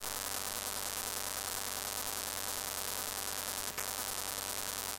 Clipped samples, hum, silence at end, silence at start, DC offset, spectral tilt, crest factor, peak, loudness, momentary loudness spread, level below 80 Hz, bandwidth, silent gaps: under 0.1%; none; 0 s; 0 s; under 0.1%; 0 dB/octave; 24 dB; -16 dBFS; -36 LUFS; 0 LU; -62 dBFS; 17 kHz; none